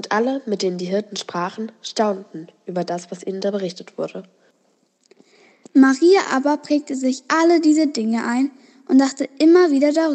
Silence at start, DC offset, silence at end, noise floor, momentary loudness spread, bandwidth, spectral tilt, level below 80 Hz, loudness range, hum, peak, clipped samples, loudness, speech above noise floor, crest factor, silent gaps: 0 s; under 0.1%; 0 s; -63 dBFS; 15 LU; 8.8 kHz; -5 dB/octave; under -90 dBFS; 10 LU; none; -2 dBFS; under 0.1%; -19 LUFS; 45 dB; 16 dB; none